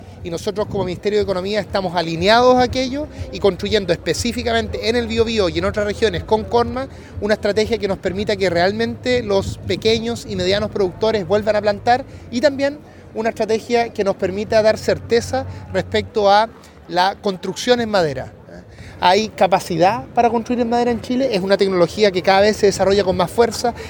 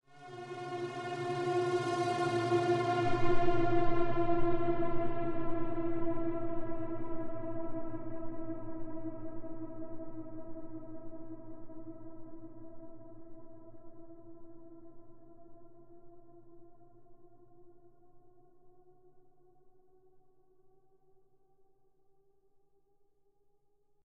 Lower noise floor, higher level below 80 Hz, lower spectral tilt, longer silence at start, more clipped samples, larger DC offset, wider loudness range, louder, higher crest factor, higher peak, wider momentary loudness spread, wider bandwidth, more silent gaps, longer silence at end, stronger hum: second, -38 dBFS vs -69 dBFS; first, -40 dBFS vs -48 dBFS; second, -5 dB/octave vs -7 dB/octave; second, 0 s vs 0.15 s; neither; neither; second, 3 LU vs 24 LU; first, -18 LUFS vs -36 LUFS; about the same, 18 dB vs 18 dB; first, 0 dBFS vs -14 dBFS; second, 9 LU vs 24 LU; first, 19 kHz vs 9.8 kHz; neither; second, 0 s vs 4.45 s; neither